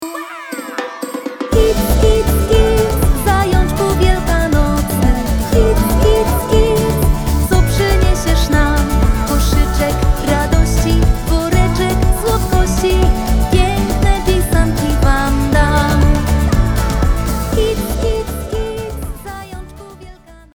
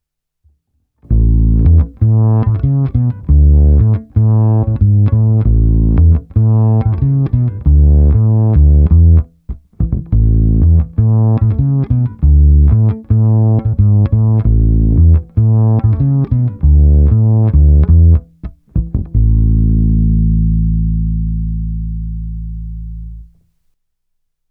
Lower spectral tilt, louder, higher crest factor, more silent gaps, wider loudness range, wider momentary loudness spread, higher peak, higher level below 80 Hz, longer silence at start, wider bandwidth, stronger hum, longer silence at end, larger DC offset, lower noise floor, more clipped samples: second, -5.5 dB/octave vs -14 dB/octave; about the same, -14 LUFS vs -12 LUFS; about the same, 12 dB vs 10 dB; neither; about the same, 2 LU vs 4 LU; about the same, 11 LU vs 11 LU; about the same, 0 dBFS vs 0 dBFS; about the same, -16 dBFS vs -14 dBFS; second, 0 s vs 1.1 s; first, over 20 kHz vs 1.8 kHz; neither; second, 0.25 s vs 1.25 s; first, 0.2% vs under 0.1%; second, -37 dBFS vs -66 dBFS; neither